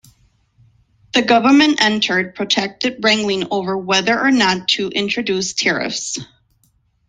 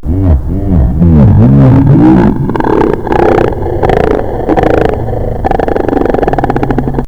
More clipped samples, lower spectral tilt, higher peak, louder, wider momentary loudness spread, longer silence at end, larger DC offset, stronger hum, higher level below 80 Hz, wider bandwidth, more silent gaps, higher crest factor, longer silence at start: second, under 0.1% vs 3%; second, -3 dB/octave vs -10 dB/octave; about the same, 0 dBFS vs 0 dBFS; second, -16 LUFS vs -9 LUFS; about the same, 9 LU vs 8 LU; first, 0.85 s vs 0 s; second, under 0.1% vs 6%; neither; second, -58 dBFS vs -16 dBFS; first, 9.6 kHz vs 7.6 kHz; neither; first, 18 dB vs 8 dB; first, 1.15 s vs 0.05 s